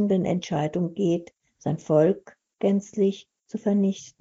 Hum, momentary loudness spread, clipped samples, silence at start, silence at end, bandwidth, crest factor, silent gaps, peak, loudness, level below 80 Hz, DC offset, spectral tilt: none; 11 LU; under 0.1%; 0 s; 0.1 s; 7.8 kHz; 16 dB; none; -8 dBFS; -25 LUFS; -66 dBFS; under 0.1%; -8 dB/octave